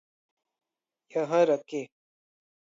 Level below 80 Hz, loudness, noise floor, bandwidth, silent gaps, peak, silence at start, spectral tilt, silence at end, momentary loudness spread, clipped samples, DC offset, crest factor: -86 dBFS; -28 LUFS; -68 dBFS; 7.6 kHz; none; -10 dBFS; 1.15 s; -6 dB/octave; 0.95 s; 13 LU; under 0.1%; under 0.1%; 20 dB